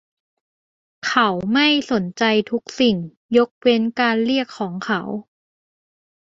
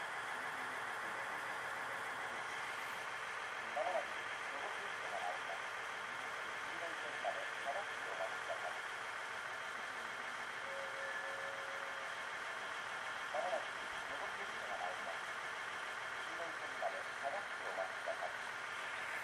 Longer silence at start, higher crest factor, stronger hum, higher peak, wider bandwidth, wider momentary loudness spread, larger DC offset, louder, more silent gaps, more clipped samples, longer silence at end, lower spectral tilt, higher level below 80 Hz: first, 1.05 s vs 0 s; about the same, 20 dB vs 18 dB; neither; first, -2 dBFS vs -26 dBFS; second, 7.8 kHz vs 15.5 kHz; first, 10 LU vs 2 LU; neither; first, -19 LUFS vs -43 LUFS; first, 3.17-3.29 s, 3.51-3.61 s vs none; neither; first, 1.05 s vs 0 s; first, -5 dB/octave vs -1 dB/octave; first, -60 dBFS vs -80 dBFS